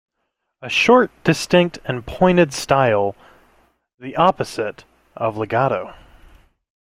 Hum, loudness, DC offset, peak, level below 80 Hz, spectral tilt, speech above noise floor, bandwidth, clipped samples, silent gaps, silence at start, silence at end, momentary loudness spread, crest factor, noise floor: none; -18 LUFS; under 0.1%; 0 dBFS; -48 dBFS; -5.5 dB/octave; 57 dB; 16 kHz; under 0.1%; 3.94-3.98 s; 0.6 s; 0.9 s; 13 LU; 18 dB; -75 dBFS